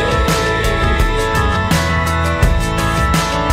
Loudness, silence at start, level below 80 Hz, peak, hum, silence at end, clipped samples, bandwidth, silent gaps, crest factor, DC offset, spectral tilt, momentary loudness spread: -15 LUFS; 0 s; -20 dBFS; 0 dBFS; none; 0 s; under 0.1%; 16.5 kHz; none; 14 dB; under 0.1%; -5 dB/octave; 1 LU